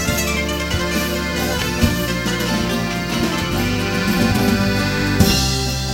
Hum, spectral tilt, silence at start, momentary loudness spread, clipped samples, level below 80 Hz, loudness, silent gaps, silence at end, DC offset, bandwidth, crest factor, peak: none; -4.5 dB/octave; 0 s; 4 LU; under 0.1%; -30 dBFS; -18 LUFS; none; 0 s; under 0.1%; 17 kHz; 18 dB; 0 dBFS